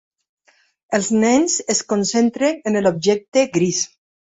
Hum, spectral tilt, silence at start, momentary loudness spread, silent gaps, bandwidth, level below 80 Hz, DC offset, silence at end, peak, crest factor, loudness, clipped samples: none; -4 dB/octave; 0.9 s; 6 LU; 3.28-3.32 s; 8.2 kHz; -60 dBFS; under 0.1%; 0.5 s; -4 dBFS; 16 dB; -18 LUFS; under 0.1%